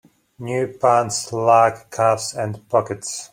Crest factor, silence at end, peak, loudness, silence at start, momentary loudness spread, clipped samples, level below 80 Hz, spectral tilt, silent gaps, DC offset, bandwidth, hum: 18 dB; 0.05 s; -2 dBFS; -19 LUFS; 0.4 s; 12 LU; under 0.1%; -62 dBFS; -4 dB/octave; none; under 0.1%; 16.5 kHz; none